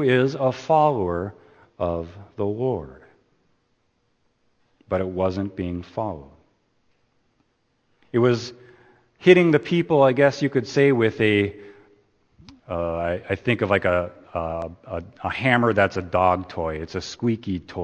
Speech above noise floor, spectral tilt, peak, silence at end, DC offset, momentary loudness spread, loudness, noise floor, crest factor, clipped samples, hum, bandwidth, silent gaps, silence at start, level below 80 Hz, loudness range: 47 dB; -7 dB/octave; 0 dBFS; 0 s; under 0.1%; 13 LU; -22 LUFS; -69 dBFS; 24 dB; under 0.1%; none; 8.6 kHz; none; 0 s; -52 dBFS; 11 LU